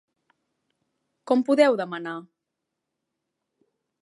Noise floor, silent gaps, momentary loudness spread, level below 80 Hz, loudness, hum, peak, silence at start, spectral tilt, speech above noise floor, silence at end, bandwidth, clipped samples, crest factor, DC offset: -83 dBFS; none; 16 LU; -86 dBFS; -23 LUFS; none; -6 dBFS; 1.25 s; -5.5 dB/octave; 61 dB; 1.75 s; 11.5 kHz; under 0.1%; 22 dB; under 0.1%